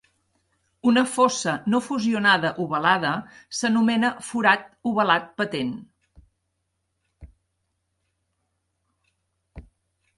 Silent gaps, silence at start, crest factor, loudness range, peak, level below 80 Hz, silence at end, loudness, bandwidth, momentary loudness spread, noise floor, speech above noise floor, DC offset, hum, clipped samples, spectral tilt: none; 0.85 s; 22 dB; 8 LU; -4 dBFS; -58 dBFS; 0.55 s; -22 LUFS; 11.5 kHz; 9 LU; -76 dBFS; 54 dB; under 0.1%; none; under 0.1%; -4 dB/octave